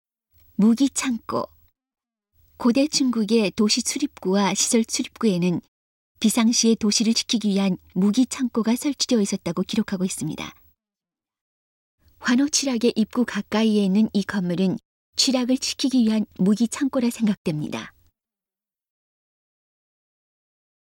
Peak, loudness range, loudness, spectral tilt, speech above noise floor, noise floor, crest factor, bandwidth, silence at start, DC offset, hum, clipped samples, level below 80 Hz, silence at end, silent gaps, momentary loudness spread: -4 dBFS; 6 LU; -22 LUFS; -4 dB/octave; over 69 dB; under -90 dBFS; 18 dB; 16.5 kHz; 0.6 s; under 0.1%; none; under 0.1%; -60 dBFS; 3.05 s; 5.68-6.15 s, 11.41-11.98 s, 14.85-15.13 s, 17.37-17.45 s; 9 LU